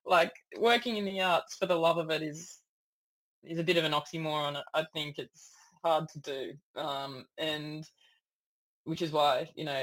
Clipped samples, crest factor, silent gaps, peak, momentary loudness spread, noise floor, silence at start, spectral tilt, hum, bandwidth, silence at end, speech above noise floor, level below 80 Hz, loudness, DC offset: under 0.1%; 20 dB; 2.68-3.42 s, 6.63-6.74 s, 8.33-8.85 s; -12 dBFS; 15 LU; -76 dBFS; 0.05 s; -4.5 dB/octave; none; 16.5 kHz; 0 s; 45 dB; -76 dBFS; -32 LUFS; under 0.1%